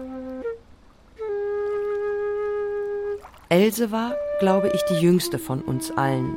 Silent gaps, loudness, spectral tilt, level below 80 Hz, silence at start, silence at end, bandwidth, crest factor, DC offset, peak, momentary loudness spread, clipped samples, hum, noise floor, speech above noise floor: none; -24 LUFS; -6 dB/octave; -54 dBFS; 0 s; 0 s; 16.5 kHz; 18 dB; under 0.1%; -6 dBFS; 13 LU; under 0.1%; none; -50 dBFS; 29 dB